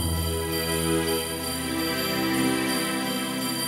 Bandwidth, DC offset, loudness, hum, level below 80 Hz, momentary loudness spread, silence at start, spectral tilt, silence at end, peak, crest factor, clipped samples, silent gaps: 18.5 kHz; under 0.1%; -25 LUFS; none; -42 dBFS; 3 LU; 0 s; -3.5 dB/octave; 0 s; -12 dBFS; 14 dB; under 0.1%; none